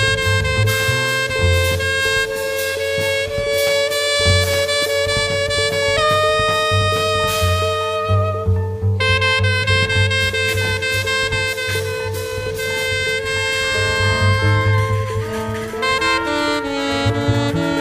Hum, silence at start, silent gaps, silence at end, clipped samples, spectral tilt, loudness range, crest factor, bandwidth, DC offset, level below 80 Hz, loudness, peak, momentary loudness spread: none; 0 s; none; 0 s; under 0.1%; -4 dB/octave; 3 LU; 16 dB; 16 kHz; under 0.1%; -36 dBFS; -17 LUFS; -2 dBFS; 5 LU